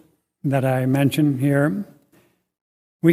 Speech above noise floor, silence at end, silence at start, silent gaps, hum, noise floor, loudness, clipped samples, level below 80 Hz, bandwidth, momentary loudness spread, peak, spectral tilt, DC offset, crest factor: 41 dB; 0 s; 0.45 s; 2.61-3.00 s; none; -60 dBFS; -20 LUFS; under 0.1%; -62 dBFS; 15.5 kHz; 11 LU; -2 dBFS; -7.5 dB/octave; under 0.1%; 18 dB